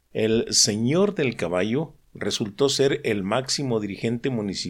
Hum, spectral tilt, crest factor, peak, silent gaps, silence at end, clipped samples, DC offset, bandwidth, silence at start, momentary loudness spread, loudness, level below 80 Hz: none; -4 dB/octave; 16 dB; -6 dBFS; none; 0 s; under 0.1%; under 0.1%; 17 kHz; 0.15 s; 9 LU; -23 LUFS; -56 dBFS